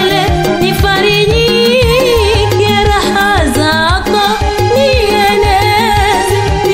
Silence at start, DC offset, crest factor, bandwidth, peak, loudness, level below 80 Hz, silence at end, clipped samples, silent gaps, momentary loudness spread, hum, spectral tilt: 0 s; under 0.1%; 10 dB; 16.5 kHz; 0 dBFS; -9 LUFS; -20 dBFS; 0 s; under 0.1%; none; 3 LU; none; -4.5 dB/octave